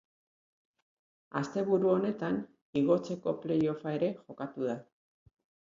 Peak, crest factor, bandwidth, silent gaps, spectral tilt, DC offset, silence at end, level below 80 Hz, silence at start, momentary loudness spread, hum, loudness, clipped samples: -14 dBFS; 20 dB; 7.6 kHz; 2.62-2.73 s; -8 dB/octave; under 0.1%; 0.95 s; -74 dBFS; 1.35 s; 9 LU; none; -32 LUFS; under 0.1%